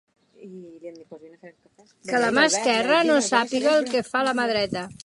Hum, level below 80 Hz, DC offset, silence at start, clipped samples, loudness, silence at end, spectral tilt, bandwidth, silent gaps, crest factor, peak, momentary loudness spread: none; -64 dBFS; under 0.1%; 0.4 s; under 0.1%; -21 LUFS; 0.1 s; -2.5 dB/octave; 11.5 kHz; none; 20 dB; -4 dBFS; 22 LU